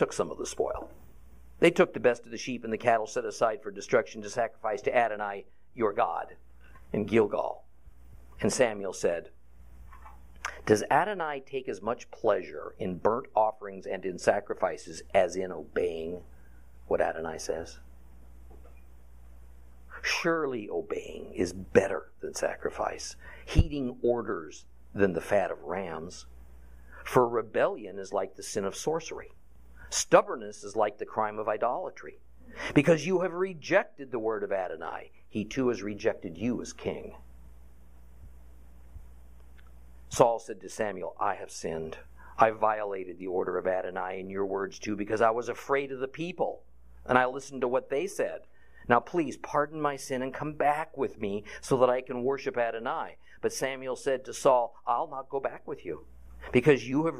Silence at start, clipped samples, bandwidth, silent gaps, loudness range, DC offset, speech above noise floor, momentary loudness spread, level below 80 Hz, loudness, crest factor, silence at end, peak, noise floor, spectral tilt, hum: 0 s; under 0.1%; 15.5 kHz; none; 5 LU; 0.3%; 25 dB; 14 LU; -50 dBFS; -30 LUFS; 26 dB; 0 s; -4 dBFS; -54 dBFS; -5 dB/octave; none